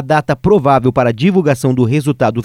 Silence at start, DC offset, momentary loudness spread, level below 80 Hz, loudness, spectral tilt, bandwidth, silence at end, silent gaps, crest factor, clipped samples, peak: 0 s; under 0.1%; 4 LU; -40 dBFS; -13 LUFS; -7.5 dB/octave; 15.5 kHz; 0 s; none; 12 dB; under 0.1%; 0 dBFS